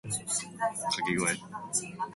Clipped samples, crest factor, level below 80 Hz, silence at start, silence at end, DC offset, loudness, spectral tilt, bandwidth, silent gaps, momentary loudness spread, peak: under 0.1%; 18 dB; -64 dBFS; 0.05 s; 0 s; under 0.1%; -31 LUFS; -2.5 dB/octave; 12 kHz; none; 4 LU; -16 dBFS